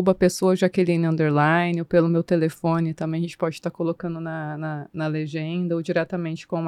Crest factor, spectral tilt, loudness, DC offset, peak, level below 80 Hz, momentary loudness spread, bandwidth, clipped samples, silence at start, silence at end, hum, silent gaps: 18 dB; -7 dB/octave; -23 LUFS; under 0.1%; -4 dBFS; -56 dBFS; 10 LU; 14 kHz; under 0.1%; 0 s; 0 s; none; none